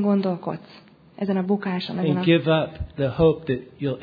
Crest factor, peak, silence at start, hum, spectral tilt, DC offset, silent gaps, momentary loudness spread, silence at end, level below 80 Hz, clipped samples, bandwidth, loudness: 18 dB; -6 dBFS; 0 s; none; -9.5 dB/octave; under 0.1%; none; 11 LU; 0 s; -46 dBFS; under 0.1%; 5 kHz; -23 LUFS